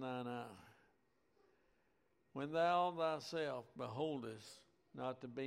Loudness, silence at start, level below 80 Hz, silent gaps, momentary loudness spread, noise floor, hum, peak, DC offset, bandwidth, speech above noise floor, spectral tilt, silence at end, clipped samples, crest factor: -42 LUFS; 0 s; -84 dBFS; none; 20 LU; -80 dBFS; none; -24 dBFS; under 0.1%; 15 kHz; 38 dB; -5.5 dB/octave; 0 s; under 0.1%; 20 dB